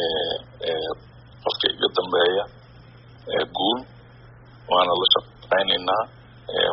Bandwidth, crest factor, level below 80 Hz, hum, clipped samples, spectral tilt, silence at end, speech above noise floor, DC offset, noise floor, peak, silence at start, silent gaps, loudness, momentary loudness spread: 5.8 kHz; 22 dB; -56 dBFS; none; under 0.1%; -0.5 dB/octave; 0 s; 25 dB; under 0.1%; -47 dBFS; -2 dBFS; 0 s; none; -22 LUFS; 13 LU